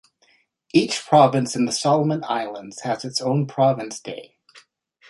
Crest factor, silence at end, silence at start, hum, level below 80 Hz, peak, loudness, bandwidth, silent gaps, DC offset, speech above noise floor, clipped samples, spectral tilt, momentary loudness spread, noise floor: 20 dB; 0.5 s; 0.75 s; none; -66 dBFS; -2 dBFS; -21 LUFS; 11.5 kHz; none; under 0.1%; 41 dB; under 0.1%; -5 dB/octave; 16 LU; -62 dBFS